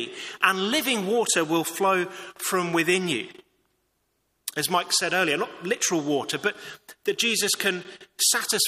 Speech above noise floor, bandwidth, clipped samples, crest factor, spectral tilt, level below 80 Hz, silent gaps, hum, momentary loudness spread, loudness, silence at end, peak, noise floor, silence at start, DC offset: 48 dB; 15.5 kHz; under 0.1%; 22 dB; -2 dB/octave; -72 dBFS; none; none; 12 LU; -24 LUFS; 0 s; -4 dBFS; -73 dBFS; 0 s; under 0.1%